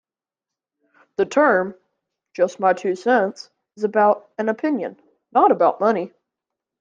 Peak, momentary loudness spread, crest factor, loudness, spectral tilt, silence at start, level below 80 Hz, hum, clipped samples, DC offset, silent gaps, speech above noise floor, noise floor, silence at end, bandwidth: -4 dBFS; 15 LU; 18 dB; -20 LUFS; -6 dB/octave; 1.2 s; -72 dBFS; none; under 0.1%; under 0.1%; none; 69 dB; -88 dBFS; 0.75 s; 7.6 kHz